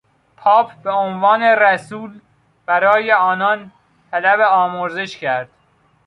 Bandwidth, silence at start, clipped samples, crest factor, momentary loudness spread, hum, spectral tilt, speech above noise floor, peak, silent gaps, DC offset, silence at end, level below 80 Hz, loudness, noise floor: 11 kHz; 0.4 s; under 0.1%; 16 dB; 13 LU; none; -5 dB/octave; 42 dB; -2 dBFS; none; under 0.1%; 0.6 s; -66 dBFS; -16 LUFS; -57 dBFS